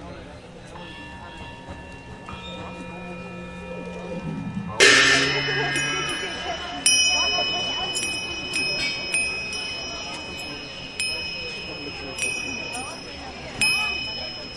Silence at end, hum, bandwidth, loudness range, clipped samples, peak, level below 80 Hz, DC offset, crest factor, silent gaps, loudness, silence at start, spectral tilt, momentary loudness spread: 0 s; none; 12 kHz; 17 LU; under 0.1%; -2 dBFS; -50 dBFS; under 0.1%; 24 dB; none; -22 LUFS; 0 s; -1.5 dB/octave; 21 LU